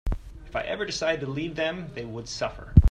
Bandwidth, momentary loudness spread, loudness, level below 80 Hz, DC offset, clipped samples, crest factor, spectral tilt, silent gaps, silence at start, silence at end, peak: 9.4 kHz; 13 LU; -28 LUFS; -32 dBFS; under 0.1%; under 0.1%; 24 dB; -6 dB/octave; none; 0.05 s; 0 s; -2 dBFS